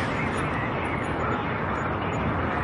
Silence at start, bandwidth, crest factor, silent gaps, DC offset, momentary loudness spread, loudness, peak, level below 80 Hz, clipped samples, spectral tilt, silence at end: 0 s; 11.5 kHz; 12 dB; none; under 0.1%; 1 LU; -27 LUFS; -14 dBFS; -42 dBFS; under 0.1%; -6.5 dB/octave; 0 s